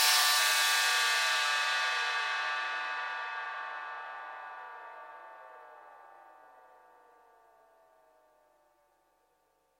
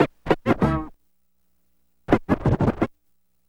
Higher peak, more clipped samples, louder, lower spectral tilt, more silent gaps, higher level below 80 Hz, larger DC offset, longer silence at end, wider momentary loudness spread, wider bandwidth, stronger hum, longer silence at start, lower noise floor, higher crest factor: second, -14 dBFS vs -2 dBFS; neither; second, -28 LUFS vs -23 LUFS; second, 5 dB/octave vs -8.5 dB/octave; neither; second, -90 dBFS vs -38 dBFS; neither; first, 3.5 s vs 0.6 s; first, 24 LU vs 8 LU; first, 16.5 kHz vs 12.5 kHz; second, none vs 60 Hz at -50 dBFS; about the same, 0 s vs 0 s; about the same, -73 dBFS vs -73 dBFS; about the same, 20 dB vs 22 dB